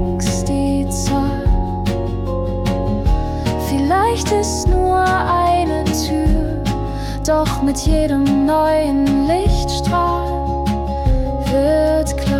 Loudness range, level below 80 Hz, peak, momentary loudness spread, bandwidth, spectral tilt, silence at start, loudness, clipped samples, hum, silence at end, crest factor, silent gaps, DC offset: 3 LU; -22 dBFS; -6 dBFS; 6 LU; 16 kHz; -6 dB/octave; 0 s; -17 LUFS; under 0.1%; none; 0 s; 10 dB; none; under 0.1%